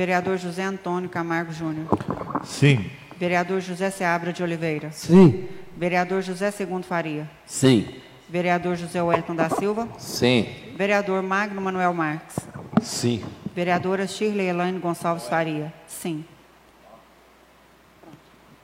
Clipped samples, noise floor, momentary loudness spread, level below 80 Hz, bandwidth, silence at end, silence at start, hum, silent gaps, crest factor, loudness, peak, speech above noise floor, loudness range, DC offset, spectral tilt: under 0.1%; -54 dBFS; 12 LU; -58 dBFS; 16 kHz; 0.45 s; 0 s; none; none; 20 dB; -24 LUFS; -4 dBFS; 31 dB; 6 LU; under 0.1%; -6 dB/octave